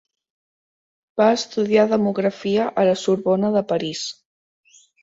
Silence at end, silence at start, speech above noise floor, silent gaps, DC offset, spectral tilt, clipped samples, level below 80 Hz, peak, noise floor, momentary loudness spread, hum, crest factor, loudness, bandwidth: 0.9 s; 1.15 s; over 71 dB; none; under 0.1%; -5.5 dB/octave; under 0.1%; -64 dBFS; -4 dBFS; under -90 dBFS; 9 LU; none; 18 dB; -20 LUFS; 8 kHz